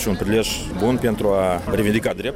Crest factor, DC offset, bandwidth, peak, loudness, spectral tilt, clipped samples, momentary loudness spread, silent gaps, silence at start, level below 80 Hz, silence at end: 12 dB; under 0.1%; 16.5 kHz; -8 dBFS; -20 LUFS; -5 dB/octave; under 0.1%; 2 LU; none; 0 s; -36 dBFS; 0 s